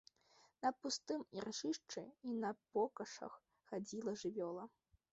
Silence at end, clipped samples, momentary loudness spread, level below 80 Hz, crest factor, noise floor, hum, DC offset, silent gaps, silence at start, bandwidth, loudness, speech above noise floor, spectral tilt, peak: 0.45 s; under 0.1%; 10 LU; -84 dBFS; 20 dB; -73 dBFS; none; under 0.1%; none; 0.6 s; 8 kHz; -45 LUFS; 29 dB; -3.5 dB/octave; -26 dBFS